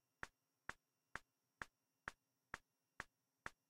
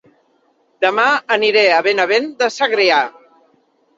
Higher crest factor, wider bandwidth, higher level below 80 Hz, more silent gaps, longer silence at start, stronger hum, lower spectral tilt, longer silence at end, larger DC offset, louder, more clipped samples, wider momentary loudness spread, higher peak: first, 30 dB vs 16 dB; first, 15.5 kHz vs 7.8 kHz; second, -76 dBFS vs -70 dBFS; neither; second, 0.25 s vs 0.8 s; neither; about the same, -3 dB/octave vs -2.5 dB/octave; second, 0.2 s vs 0.85 s; neither; second, -58 LUFS vs -14 LUFS; neither; second, 1 LU vs 6 LU; second, -28 dBFS vs -2 dBFS